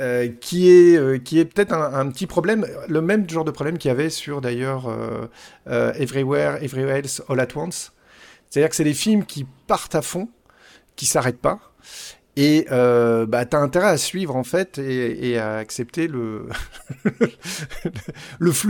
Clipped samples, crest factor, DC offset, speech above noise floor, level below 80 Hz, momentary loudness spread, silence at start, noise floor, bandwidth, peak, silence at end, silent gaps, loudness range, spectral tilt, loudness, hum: under 0.1%; 18 dB; under 0.1%; 32 dB; -50 dBFS; 14 LU; 0 s; -52 dBFS; 18 kHz; -2 dBFS; 0 s; none; 6 LU; -5 dB/octave; -20 LUFS; none